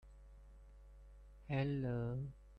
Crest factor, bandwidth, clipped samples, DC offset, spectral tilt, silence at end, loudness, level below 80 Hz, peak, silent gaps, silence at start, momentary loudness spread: 18 dB; 5.4 kHz; under 0.1%; under 0.1%; -9.5 dB/octave; 0 s; -41 LUFS; -58 dBFS; -26 dBFS; none; 0.05 s; 24 LU